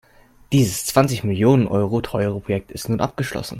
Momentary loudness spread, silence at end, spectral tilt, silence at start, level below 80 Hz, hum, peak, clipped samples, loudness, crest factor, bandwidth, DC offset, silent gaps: 9 LU; 0 s; -6 dB/octave; 0.5 s; -46 dBFS; none; 0 dBFS; under 0.1%; -20 LUFS; 20 dB; 16.5 kHz; under 0.1%; none